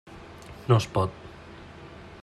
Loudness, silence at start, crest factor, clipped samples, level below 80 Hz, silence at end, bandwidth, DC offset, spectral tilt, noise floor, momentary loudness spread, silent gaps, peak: -26 LUFS; 0.1 s; 22 dB; under 0.1%; -54 dBFS; 0.05 s; 12 kHz; under 0.1%; -6.5 dB/octave; -45 dBFS; 22 LU; none; -8 dBFS